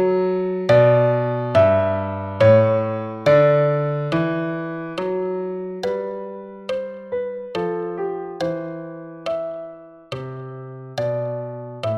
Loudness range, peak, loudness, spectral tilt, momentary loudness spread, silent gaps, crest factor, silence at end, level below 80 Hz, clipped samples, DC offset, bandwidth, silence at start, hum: 12 LU; -4 dBFS; -20 LUFS; -8 dB/octave; 18 LU; none; 18 dB; 0 s; -58 dBFS; under 0.1%; under 0.1%; 8.4 kHz; 0 s; none